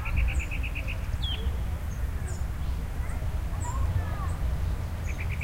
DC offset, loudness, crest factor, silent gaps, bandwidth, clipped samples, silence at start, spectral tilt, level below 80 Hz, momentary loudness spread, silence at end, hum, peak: under 0.1%; -32 LUFS; 14 dB; none; 16 kHz; under 0.1%; 0 s; -5.5 dB/octave; -30 dBFS; 4 LU; 0 s; none; -16 dBFS